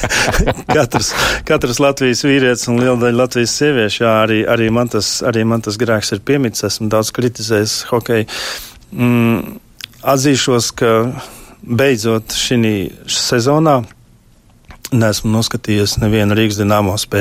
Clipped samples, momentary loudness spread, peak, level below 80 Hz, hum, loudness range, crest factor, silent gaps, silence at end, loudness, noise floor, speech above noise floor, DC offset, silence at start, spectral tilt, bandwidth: under 0.1%; 8 LU; 0 dBFS; -34 dBFS; none; 3 LU; 14 dB; none; 0 s; -14 LUFS; -47 dBFS; 33 dB; under 0.1%; 0 s; -4.5 dB/octave; 16 kHz